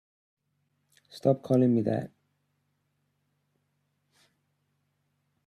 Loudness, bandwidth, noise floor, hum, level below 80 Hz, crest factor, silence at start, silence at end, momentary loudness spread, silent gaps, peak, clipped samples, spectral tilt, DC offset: -27 LUFS; 11.5 kHz; -76 dBFS; none; -74 dBFS; 22 dB; 1.15 s; 3.4 s; 10 LU; none; -10 dBFS; under 0.1%; -9 dB/octave; under 0.1%